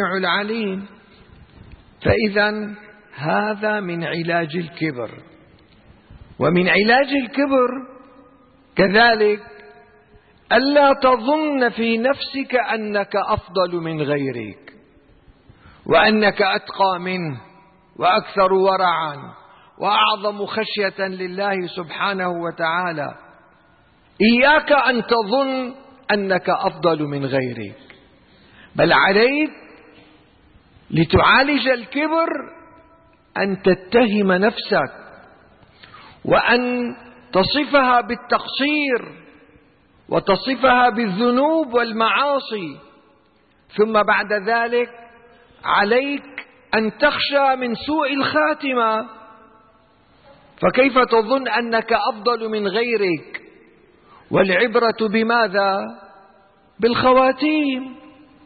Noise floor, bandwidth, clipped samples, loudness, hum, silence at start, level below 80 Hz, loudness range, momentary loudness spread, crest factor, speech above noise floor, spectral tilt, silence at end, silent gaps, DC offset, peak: -57 dBFS; 4.8 kHz; under 0.1%; -18 LUFS; none; 0 s; -50 dBFS; 4 LU; 14 LU; 16 dB; 39 dB; -10.5 dB/octave; 0.45 s; none; under 0.1%; -2 dBFS